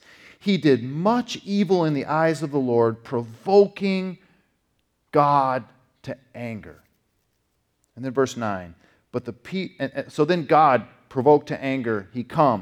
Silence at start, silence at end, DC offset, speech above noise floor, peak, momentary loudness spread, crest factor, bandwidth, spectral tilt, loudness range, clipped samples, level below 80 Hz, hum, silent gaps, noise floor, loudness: 0.45 s; 0 s; under 0.1%; 49 dB; -4 dBFS; 16 LU; 20 dB; 12 kHz; -7 dB/octave; 9 LU; under 0.1%; -66 dBFS; none; none; -71 dBFS; -22 LUFS